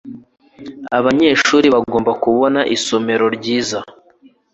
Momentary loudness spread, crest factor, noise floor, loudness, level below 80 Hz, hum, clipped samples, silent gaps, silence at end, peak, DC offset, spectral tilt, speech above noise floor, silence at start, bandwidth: 13 LU; 16 dB; -50 dBFS; -15 LUFS; -54 dBFS; none; under 0.1%; none; 0.65 s; 0 dBFS; under 0.1%; -4 dB/octave; 36 dB; 0.05 s; 8.2 kHz